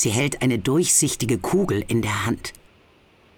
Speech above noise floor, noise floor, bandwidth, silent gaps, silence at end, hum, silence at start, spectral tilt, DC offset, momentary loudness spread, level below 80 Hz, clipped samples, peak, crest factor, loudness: 34 dB; -55 dBFS; over 20 kHz; none; 0.85 s; none; 0 s; -4 dB/octave; under 0.1%; 9 LU; -46 dBFS; under 0.1%; -6 dBFS; 16 dB; -21 LUFS